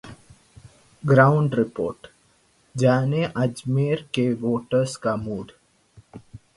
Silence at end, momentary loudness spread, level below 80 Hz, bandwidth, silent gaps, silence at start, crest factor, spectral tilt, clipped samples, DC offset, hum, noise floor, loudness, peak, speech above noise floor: 0.2 s; 15 LU; -56 dBFS; 11.5 kHz; none; 0.05 s; 22 dB; -7 dB/octave; under 0.1%; under 0.1%; none; -61 dBFS; -22 LUFS; -2 dBFS; 40 dB